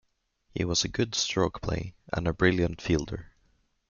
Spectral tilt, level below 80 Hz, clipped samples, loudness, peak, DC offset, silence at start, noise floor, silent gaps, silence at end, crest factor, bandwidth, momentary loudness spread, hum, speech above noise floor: -4.5 dB/octave; -46 dBFS; under 0.1%; -28 LUFS; -8 dBFS; under 0.1%; 0.55 s; -69 dBFS; none; 0.65 s; 22 dB; 7.4 kHz; 11 LU; none; 41 dB